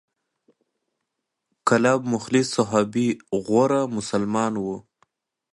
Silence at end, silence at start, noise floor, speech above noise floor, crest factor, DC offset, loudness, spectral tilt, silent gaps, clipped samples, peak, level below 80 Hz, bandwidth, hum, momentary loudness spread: 0.75 s; 1.65 s; -81 dBFS; 59 dB; 20 dB; under 0.1%; -22 LUFS; -5.5 dB/octave; none; under 0.1%; -4 dBFS; -62 dBFS; 11.5 kHz; none; 8 LU